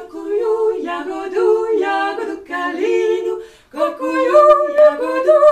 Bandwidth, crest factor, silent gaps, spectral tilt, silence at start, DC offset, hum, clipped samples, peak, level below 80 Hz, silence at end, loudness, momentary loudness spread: 9.4 kHz; 16 dB; none; -3.5 dB/octave; 0 s; under 0.1%; none; under 0.1%; 0 dBFS; -58 dBFS; 0 s; -16 LUFS; 13 LU